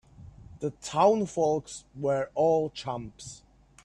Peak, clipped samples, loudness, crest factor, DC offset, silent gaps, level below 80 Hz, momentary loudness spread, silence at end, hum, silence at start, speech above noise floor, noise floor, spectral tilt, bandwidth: -10 dBFS; under 0.1%; -28 LUFS; 20 dB; under 0.1%; none; -60 dBFS; 19 LU; 0.5 s; none; 0.2 s; 21 dB; -49 dBFS; -5.5 dB/octave; 11 kHz